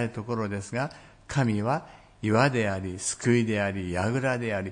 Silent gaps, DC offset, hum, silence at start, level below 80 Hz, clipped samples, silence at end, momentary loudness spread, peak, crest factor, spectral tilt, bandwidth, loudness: none; under 0.1%; none; 0 s; -58 dBFS; under 0.1%; 0 s; 8 LU; -8 dBFS; 20 dB; -5.5 dB/octave; 10.5 kHz; -27 LUFS